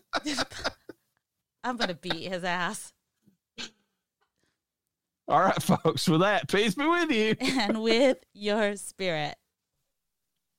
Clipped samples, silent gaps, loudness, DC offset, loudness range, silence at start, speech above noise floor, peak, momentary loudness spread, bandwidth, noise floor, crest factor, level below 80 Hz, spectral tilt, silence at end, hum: under 0.1%; none; -27 LUFS; under 0.1%; 9 LU; 0.15 s; 60 dB; -10 dBFS; 13 LU; 16.5 kHz; -87 dBFS; 18 dB; -62 dBFS; -4.5 dB/octave; 1.25 s; none